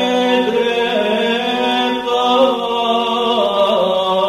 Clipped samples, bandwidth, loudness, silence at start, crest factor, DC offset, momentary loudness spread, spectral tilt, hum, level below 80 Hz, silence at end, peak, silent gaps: under 0.1%; 14 kHz; -15 LUFS; 0 s; 14 dB; under 0.1%; 3 LU; -4 dB/octave; none; -54 dBFS; 0 s; -2 dBFS; none